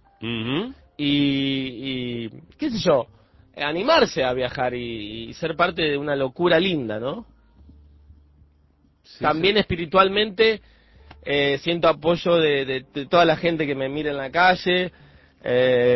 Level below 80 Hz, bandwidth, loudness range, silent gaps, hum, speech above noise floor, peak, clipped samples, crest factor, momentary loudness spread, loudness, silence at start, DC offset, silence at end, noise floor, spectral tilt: -50 dBFS; 6 kHz; 5 LU; none; none; 38 dB; -4 dBFS; under 0.1%; 18 dB; 12 LU; -22 LUFS; 0.2 s; under 0.1%; 0 s; -60 dBFS; -6 dB/octave